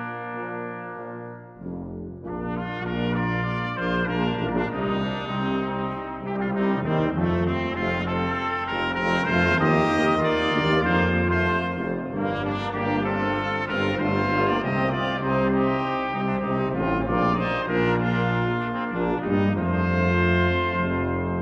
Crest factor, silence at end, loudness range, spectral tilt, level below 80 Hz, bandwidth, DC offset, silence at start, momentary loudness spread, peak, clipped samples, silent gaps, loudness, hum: 16 dB; 0 s; 5 LU; -7.5 dB/octave; -46 dBFS; 8 kHz; under 0.1%; 0 s; 11 LU; -8 dBFS; under 0.1%; none; -24 LUFS; none